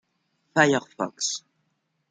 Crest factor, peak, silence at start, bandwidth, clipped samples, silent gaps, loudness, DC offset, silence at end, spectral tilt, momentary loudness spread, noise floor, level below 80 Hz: 24 dB; -4 dBFS; 0.55 s; 10 kHz; under 0.1%; none; -25 LUFS; under 0.1%; 0.7 s; -3.5 dB/octave; 12 LU; -74 dBFS; -70 dBFS